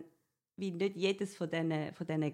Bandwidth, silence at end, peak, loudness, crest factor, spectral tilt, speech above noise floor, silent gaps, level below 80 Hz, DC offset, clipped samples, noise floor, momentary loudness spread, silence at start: 12.5 kHz; 0 s; -20 dBFS; -36 LUFS; 16 dB; -6 dB/octave; 38 dB; none; -82 dBFS; under 0.1%; under 0.1%; -73 dBFS; 6 LU; 0 s